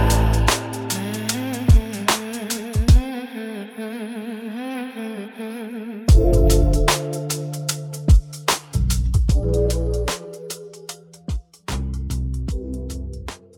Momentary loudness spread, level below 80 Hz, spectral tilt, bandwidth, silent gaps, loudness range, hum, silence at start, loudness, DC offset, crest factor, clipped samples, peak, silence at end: 14 LU; -22 dBFS; -5 dB/octave; 18.5 kHz; none; 8 LU; none; 0 s; -22 LUFS; under 0.1%; 18 dB; under 0.1%; -2 dBFS; 0.2 s